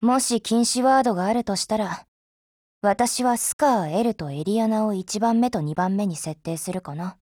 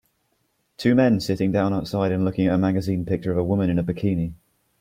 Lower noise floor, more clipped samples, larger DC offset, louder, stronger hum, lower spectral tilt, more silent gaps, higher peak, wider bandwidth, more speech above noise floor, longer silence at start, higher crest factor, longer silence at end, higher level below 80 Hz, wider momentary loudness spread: first, under -90 dBFS vs -70 dBFS; neither; neither; about the same, -23 LUFS vs -22 LUFS; neither; second, -4.5 dB/octave vs -8 dB/octave; first, 2.08-2.81 s, 3.53-3.59 s vs none; about the same, -6 dBFS vs -6 dBFS; first, 18.5 kHz vs 15.5 kHz; first, over 68 dB vs 49 dB; second, 0 s vs 0.8 s; about the same, 16 dB vs 16 dB; second, 0.1 s vs 0.45 s; second, -60 dBFS vs -50 dBFS; first, 10 LU vs 6 LU